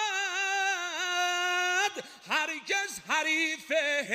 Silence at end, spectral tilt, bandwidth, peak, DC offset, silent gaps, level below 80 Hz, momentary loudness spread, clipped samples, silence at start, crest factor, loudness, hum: 0 s; 0 dB/octave; 15 kHz; -14 dBFS; under 0.1%; none; -78 dBFS; 4 LU; under 0.1%; 0 s; 16 dB; -28 LUFS; none